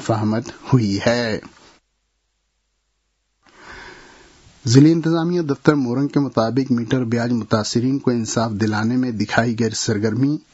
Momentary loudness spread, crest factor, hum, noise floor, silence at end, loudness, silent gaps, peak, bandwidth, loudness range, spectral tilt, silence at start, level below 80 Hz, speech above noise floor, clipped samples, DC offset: 6 LU; 20 dB; none; -70 dBFS; 0.15 s; -19 LUFS; none; 0 dBFS; 8 kHz; 7 LU; -6 dB/octave; 0 s; -56 dBFS; 52 dB; under 0.1%; under 0.1%